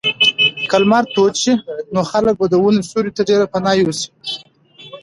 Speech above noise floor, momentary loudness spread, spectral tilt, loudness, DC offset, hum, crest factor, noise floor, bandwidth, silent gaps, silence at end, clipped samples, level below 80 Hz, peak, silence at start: 28 dB; 10 LU; -4 dB/octave; -15 LUFS; under 0.1%; none; 16 dB; -43 dBFS; 11.5 kHz; none; 0.05 s; under 0.1%; -52 dBFS; 0 dBFS; 0.05 s